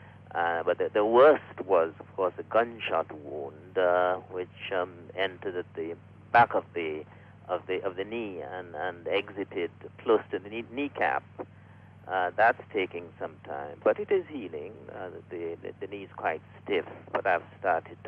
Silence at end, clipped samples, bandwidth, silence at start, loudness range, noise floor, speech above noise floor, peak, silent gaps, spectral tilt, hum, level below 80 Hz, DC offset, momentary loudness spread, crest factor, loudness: 0 s; under 0.1%; 5.6 kHz; 0 s; 8 LU; -52 dBFS; 22 dB; -10 dBFS; none; -7.5 dB/octave; none; -72 dBFS; under 0.1%; 16 LU; 20 dB; -29 LUFS